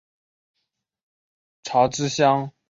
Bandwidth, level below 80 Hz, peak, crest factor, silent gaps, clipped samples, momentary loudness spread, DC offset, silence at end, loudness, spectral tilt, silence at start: 7.8 kHz; -62 dBFS; -4 dBFS; 20 dB; none; under 0.1%; 6 LU; under 0.1%; 0.2 s; -21 LUFS; -4.5 dB/octave; 1.65 s